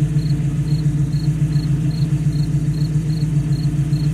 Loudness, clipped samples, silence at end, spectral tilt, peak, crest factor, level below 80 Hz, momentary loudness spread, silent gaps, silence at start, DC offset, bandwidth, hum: -19 LUFS; under 0.1%; 0 s; -8 dB/octave; -8 dBFS; 10 dB; -32 dBFS; 1 LU; none; 0 s; under 0.1%; 11 kHz; none